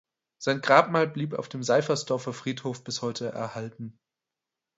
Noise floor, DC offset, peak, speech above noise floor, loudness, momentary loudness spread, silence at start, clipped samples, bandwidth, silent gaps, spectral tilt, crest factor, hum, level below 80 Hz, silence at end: -88 dBFS; under 0.1%; -4 dBFS; 61 dB; -27 LUFS; 15 LU; 0.4 s; under 0.1%; 8 kHz; none; -4.5 dB/octave; 24 dB; none; -72 dBFS; 0.85 s